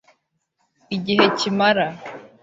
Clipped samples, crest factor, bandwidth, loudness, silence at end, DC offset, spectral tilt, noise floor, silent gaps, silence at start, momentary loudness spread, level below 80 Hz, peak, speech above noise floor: under 0.1%; 20 dB; 8 kHz; -19 LUFS; 0.15 s; under 0.1%; -4.5 dB/octave; -71 dBFS; none; 0.9 s; 16 LU; -64 dBFS; -2 dBFS; 52 dB